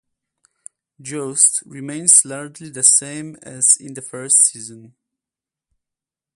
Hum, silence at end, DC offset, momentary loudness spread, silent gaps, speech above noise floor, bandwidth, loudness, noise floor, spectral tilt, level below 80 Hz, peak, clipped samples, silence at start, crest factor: none; 1.55 s; under 0.1%; 21 LU; none; 70 dB; 16 kHz; -13 LUFS; -88 dBFS; -1.5 dB/octave; -72 dBFS; 0 dBFS; under 0.1%; 1 s; 20 dB